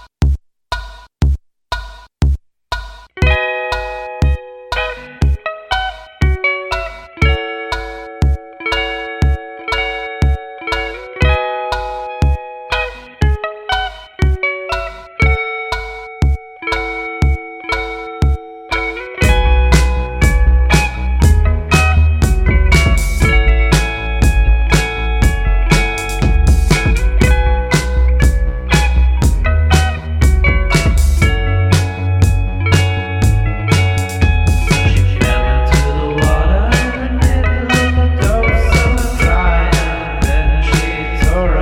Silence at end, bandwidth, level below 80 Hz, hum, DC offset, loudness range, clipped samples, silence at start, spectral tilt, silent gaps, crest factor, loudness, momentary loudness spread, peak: 0 s; 15.5 kHz; -16 dBFS; none; under 0.1%; 6 LU; under 0.1%; 0.2 s; -5.5 dB/octave; none; 12 dB; -15 LUFS; 9 LU; 0 dBFS